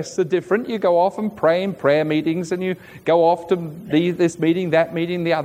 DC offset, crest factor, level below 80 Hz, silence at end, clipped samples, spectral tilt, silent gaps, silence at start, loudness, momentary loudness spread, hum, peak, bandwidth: under 0.1%; 16 dB; -62 dBFS; 0 s; under 0.1%; -6.5 dB/octave; none; 0 s; -20 LUFS; 6 LU; none; -4 dBFS; 15 kHz